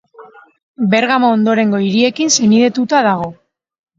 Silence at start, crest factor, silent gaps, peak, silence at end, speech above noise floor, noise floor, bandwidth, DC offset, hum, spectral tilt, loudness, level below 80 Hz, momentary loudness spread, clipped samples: 0.2 s; 14 dB; 0.63-0.74 s; 0 dBFS; 0.65 s; 28 dB; -41 dBFS; 7.6 kHz; under 0.1%; none; -4 dB/octave; -13 LUFS; -58 dBFS; 6 LU; under 0.1%